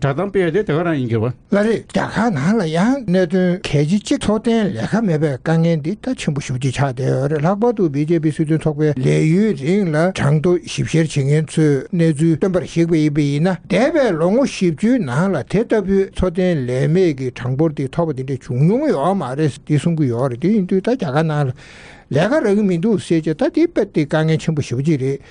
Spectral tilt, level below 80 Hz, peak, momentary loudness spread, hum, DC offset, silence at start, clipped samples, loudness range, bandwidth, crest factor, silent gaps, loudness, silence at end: -7 dB/octave; -44 dBFS; -4 dBFS; 5 LU; none; under 0.1%; 0 s; under 0.1%; 2 LU; 10 kHz; 12 dB; none; -17 LUFS; 0.15 s